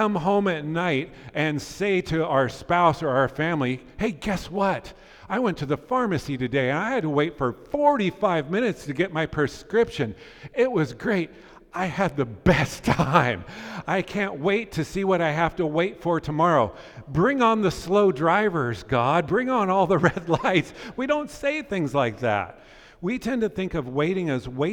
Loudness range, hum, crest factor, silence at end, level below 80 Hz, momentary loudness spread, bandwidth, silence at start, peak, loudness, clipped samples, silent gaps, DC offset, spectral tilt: 4 LU; none; 22 dB; 0 s; -48 dBFS; 8 LU; 18 kHz; 0 s; -2 dBFS; -24 LUFS; under 0.1%; none; under 0.1%; -6.5 dB/octave